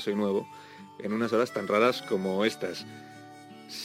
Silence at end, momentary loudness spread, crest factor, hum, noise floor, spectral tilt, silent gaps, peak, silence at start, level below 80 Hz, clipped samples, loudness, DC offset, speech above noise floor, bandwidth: 0 s; 23 LU; 20 dB; none; -48 dBFS; -5 dB/octave; none; -10 dBFS; 0 s; -82 dBFS; under 0.1%; -28 LUFS; under 0.1%; 19 dB; 16 kHz